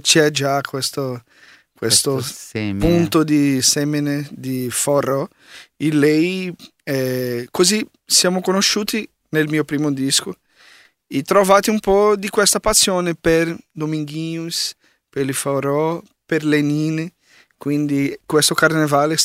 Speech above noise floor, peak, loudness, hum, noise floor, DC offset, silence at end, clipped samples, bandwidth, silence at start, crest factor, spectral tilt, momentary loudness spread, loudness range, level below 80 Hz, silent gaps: 32 dB; 0 dBFS; -18 LUFS; none; -50 dBFS; under 0.1%; 0 s; under 0.1%; 16 kHz; 0.05 s; 18 dB; -3.5 dB/octave; 12 LU; 5 LU; -44 dBFS; none